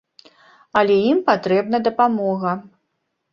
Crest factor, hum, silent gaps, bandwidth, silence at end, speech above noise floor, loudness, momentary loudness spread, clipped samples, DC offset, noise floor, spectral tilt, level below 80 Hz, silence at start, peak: 18 dB; none; none; 7 kHz; 0.65 s; 56 dB; -19 LUFS; 7 LU; under 0.1%; under 0.1%; -74 dBFS; -7.5 dB/octave; -62 dBFS; 0.75 s; -2 dBFS